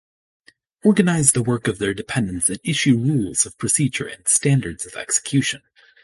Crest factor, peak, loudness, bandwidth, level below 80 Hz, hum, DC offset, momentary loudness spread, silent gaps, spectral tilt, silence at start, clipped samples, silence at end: 20 dB; 0 dBFS; -19 LUFS; 12 kHz; -50 dBFS; none; under 0.1%; 8 LU; none; -4 dB/octave; 0.85 s; under 0.1%; 0.45 s